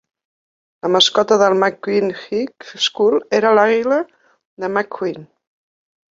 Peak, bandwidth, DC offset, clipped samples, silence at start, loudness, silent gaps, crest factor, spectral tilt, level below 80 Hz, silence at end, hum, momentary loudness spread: -2 dBFS; 7.6 kHz; under 0.1%; under 0.1%; 0.85 s; -16 LUFS; 4.45-4.57 s; 16 dB; -3.5 dB/octave; -66 dBFS; 0.85 s; none; 13 LU